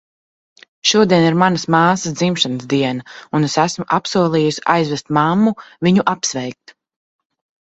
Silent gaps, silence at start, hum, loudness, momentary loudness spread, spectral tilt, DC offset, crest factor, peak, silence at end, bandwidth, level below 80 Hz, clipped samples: none; 0.85 s; none; -16 LUFS; 8 LU; -4.5 dB/octave; under 0.1%; 18 dB; 0 dBFS; 1.2 s; 8.2 kHz; -56 dBFS; under 0.1%